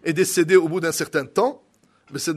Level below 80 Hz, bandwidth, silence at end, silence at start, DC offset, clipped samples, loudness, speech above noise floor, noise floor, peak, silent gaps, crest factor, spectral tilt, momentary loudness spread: -68 dBFS; 13.5 kHz; 0 s; 0.05 s; under 0.1%; under 0.1%; -20 LUFS; 39 dB; -59 dBFS; -2 dBFS; none; 18 dB; -4.5 dB/octave; 9 LU